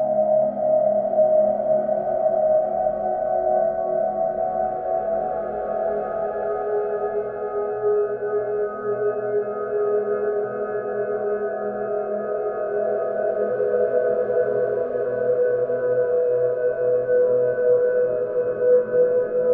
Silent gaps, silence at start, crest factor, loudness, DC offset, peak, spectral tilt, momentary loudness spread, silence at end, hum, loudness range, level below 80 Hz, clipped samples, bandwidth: none; 0 s; 12 dB; -22 LUFS; under 0.1%; -8 dBFS; -11 dB/octave; 7 LU; 0 s; none; 5 LU; -58 dBFS; under 0.1%; 2.7 kHz